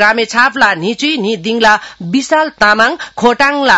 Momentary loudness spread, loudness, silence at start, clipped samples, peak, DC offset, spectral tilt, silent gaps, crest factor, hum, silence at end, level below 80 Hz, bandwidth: 6 LU; -11 LUFS; 0 s; 0.6%; 0 dBFS; under 0.1%; -3.5 dB/octave; none; 12 dB; none; 0 s; -46 dBFS; 12 kHz